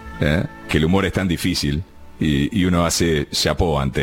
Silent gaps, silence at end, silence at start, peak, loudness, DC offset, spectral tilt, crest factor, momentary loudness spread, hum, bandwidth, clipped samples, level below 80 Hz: none; 0 s; 0 s; -4 dBFS; -19 LUFS; under 0.1%; -5 dB/octave; 16 dB; 6 LU; none; 17 kHz; under 0.1%; -32 dBFS